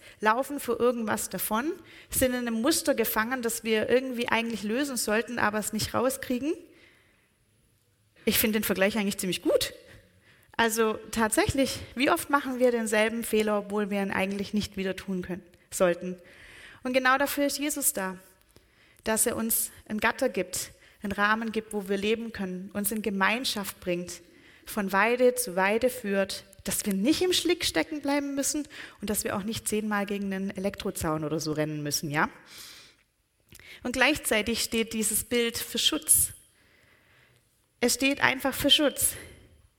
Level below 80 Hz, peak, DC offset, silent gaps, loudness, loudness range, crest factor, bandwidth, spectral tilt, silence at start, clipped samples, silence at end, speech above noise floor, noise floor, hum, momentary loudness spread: -54 dBFS; -4 dBFS; under 0.1%; none; -27 LUFS; 4 LU; 24 dB; 17 kHz; -3 dB/octave; 0.05 s; under 0.1%; 0.45 s; 42 dB; -69 dBFS; none; 10 LU